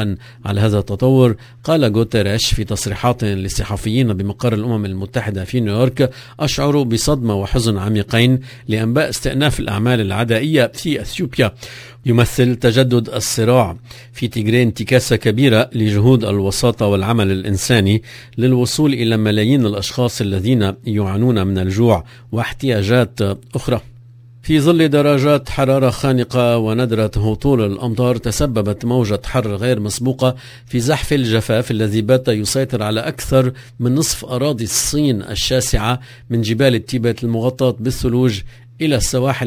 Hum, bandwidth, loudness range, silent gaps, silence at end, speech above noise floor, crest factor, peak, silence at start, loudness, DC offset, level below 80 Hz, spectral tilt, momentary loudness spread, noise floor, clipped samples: none; 16 kHz; 3 LU; none; 0 s; 25 dB; 16 dB; 0 dBFS; 0 s; -16 LUFS; under 0.1%; -34 dBFS; -5.5 dB/octave; 7 LU; -41 dBFS; under 0.1%